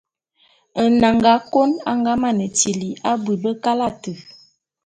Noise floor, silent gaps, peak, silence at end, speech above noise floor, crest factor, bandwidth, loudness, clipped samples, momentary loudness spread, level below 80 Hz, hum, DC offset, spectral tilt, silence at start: -60 dBFS; none; 0 dBFS; 0.55 s; 42 dB; 18 dB; 9.4 kHz; -18 LUFS; under 0.1%; 12 LU; -52 dBFS; none; under 0.1%; -4 dB/octave; 0.75 s